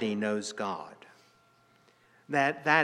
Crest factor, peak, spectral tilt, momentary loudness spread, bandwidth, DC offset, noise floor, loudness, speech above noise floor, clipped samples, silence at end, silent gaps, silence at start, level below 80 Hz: 24 dB; -8 dBFS; -4.5 dB/octave; 13 LU; 12 kHz; under 0.1%; -64 dBFS; -30 LUFS; 35 dB; under 0.1%; 0 s; none; 0 s; -84 dBFS